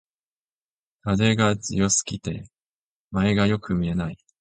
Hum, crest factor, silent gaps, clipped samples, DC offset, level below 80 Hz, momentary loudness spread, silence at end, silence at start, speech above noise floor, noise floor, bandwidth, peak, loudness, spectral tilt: none; 18 dB; 2.62-3.10 s; under 0.1%; under 0.1%; -46 dBFS; 13 LU; 0.25 s; 1.05 s; over 68 dB; under -90 dBFS; 9.4 kHz; -6 dBFS; -23 LUFS; -4.5 dB/octave